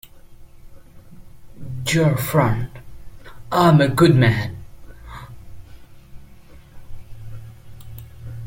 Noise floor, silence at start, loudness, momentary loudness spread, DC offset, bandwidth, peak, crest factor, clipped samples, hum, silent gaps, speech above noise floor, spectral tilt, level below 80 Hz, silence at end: -43 dBFS; 0.05 s; -17 LUFS; 26 LU; under 0.1%; 16.5 kHz; -2 dBFS; 20 dB; under 0.1%; none; none; 27 dB; -6.5 dB/octave; -42 dBFS; 0 s